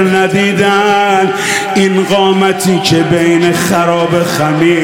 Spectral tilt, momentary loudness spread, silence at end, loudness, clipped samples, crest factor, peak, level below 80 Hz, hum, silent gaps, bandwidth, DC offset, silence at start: -5 dB/octave; 2 LU; 0 s; -10 LUFS; under 0.1%; 10 dB; 0 dBFS; -48 dBFS; none; none; 17 kHz; 0.2%; 0 s